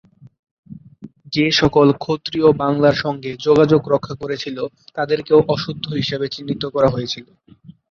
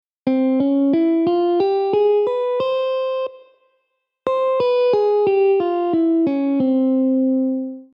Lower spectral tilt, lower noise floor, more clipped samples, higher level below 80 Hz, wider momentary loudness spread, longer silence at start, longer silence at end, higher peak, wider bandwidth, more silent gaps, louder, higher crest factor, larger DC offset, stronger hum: second, -6 dB/octave vs -8 dB/octave; second, -41 dBFS vs -72 dBFS; neither; first, -48 dBFS vs -66 dBFS; first, 12 LU vs 6 LU; first, 0.7 s vs 0.25 s; about the same, 0.2 s vs 0.1 s; first, -2 dBFS vs -6 dBFS; first, 7 kHz vs 5.6 kHz; neither; about the same, -18 LUFS vs -18 LUFS; first, 18 dB vs 12 dB; neither; neither